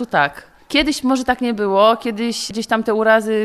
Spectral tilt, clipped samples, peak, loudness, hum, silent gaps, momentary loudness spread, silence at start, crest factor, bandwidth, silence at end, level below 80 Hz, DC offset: -4 dB/octave; under 0.1%; -2 dBFS; -17 LUFS; none; none; 7 LU; 0 s; 16 dB; 13.5 kHz; 0 s; -46 dBFS; 0.1%